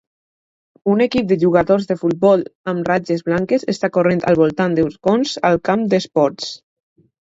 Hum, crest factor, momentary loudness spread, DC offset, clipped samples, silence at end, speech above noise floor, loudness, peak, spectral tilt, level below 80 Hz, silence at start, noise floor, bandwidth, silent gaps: none; 16 dB; 5 LU; under 0.1%; under 0.1%; 0.65 s; over 74 dB; -17 LUFS; 0 dBFS; -6.5 dB/octave; -52 dBFS; 0.85 s; under -90 dBFS; 8 kHz; 2.55-2.64 s